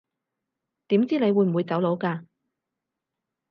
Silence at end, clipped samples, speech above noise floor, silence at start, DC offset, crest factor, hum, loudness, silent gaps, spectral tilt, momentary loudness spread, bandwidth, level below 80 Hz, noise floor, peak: 1.3 s; under 0.1%; 62 dB; 0.9 s; under 0.1%; 16 dB; none; -24 LUFS; none; -9.5 dB/octave; 8 LU; 5.6 kHz; -78 dBFS; -85 dBFS; -10 dBFS